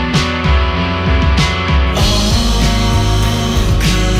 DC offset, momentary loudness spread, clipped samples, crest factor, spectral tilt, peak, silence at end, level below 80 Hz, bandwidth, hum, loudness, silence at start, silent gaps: under 0.1%; 2 LU; under 0.1%; 10 dB; -5 dB/octave; -2 dBFS; 0 s; -16 dBFS; 15.5 kHz; none; -13 LUFS; 0 s; none